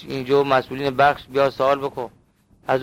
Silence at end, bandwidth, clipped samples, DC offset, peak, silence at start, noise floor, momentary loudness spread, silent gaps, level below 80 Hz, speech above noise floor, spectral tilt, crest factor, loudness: 0 s; 16 kHz; under 0.1%; under 0.1%; -4 dBFS; 0 s; -55 dBFS; 14 LU; none; -54 dBFS; 35 dB; -6 dB/octave; 18 dB; -20 LUFS